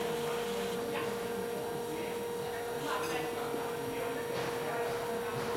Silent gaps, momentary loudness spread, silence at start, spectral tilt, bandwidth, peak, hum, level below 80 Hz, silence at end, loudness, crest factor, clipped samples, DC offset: none; 3 LU; 0 s; -4 dB/octave; 16 kHz; -22 dBFS; none; -64 dBFS; 0 s; -36 LUFS; 14 dB; under 0.1%; under 0.1%